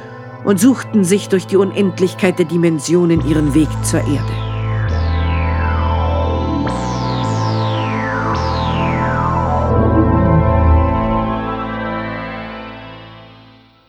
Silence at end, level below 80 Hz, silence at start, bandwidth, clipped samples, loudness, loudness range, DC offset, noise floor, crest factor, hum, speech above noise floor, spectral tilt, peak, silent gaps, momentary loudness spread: 0.55 s; -24 dBFS; 0 s; 14.5 kHz; under 0.1%; -16 LUFS; 3 LU; under 0.1%; -44 dBFS; 14 dB; none; 31 dB; -6.5 dB/octave; 0 dBFS; none; 9 LU